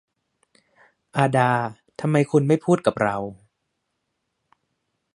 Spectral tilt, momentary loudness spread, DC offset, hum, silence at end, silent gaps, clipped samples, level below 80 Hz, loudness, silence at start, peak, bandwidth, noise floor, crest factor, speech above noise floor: -7 dB/octave; 11 LU; under 0.1%; none; 1.8 s; none; under 0.1%; -62 dBFS; -22 LUFS; 1.15 s; -4 dBFS; 11.5 kHz; -77 dBFS; 22 dB; 56 dB